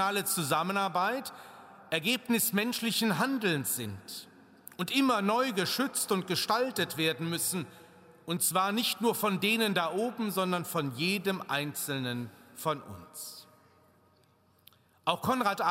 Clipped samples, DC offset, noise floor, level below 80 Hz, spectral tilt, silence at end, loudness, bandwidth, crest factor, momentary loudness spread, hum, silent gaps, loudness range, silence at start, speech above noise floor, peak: under 0.1%; under 0.1%; -66 dBFS; -76 dBFS; -3.5 dB/octave; 0 s; -30 LUFS; 16 kHz; 20 dB; 15 LU; none; none; 6 LU; 0 s; 35 dB; -10 dBFS